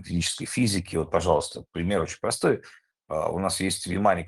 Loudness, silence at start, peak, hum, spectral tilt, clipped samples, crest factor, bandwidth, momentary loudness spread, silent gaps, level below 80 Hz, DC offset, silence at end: -26 LUFS; 0 s; -6 dBFS; none; -4.5 dB/octave; under 0.1%; 20 dB; 12.5 kHz; 6 LU; none; -52 dBFS; under 0.1%; 0 s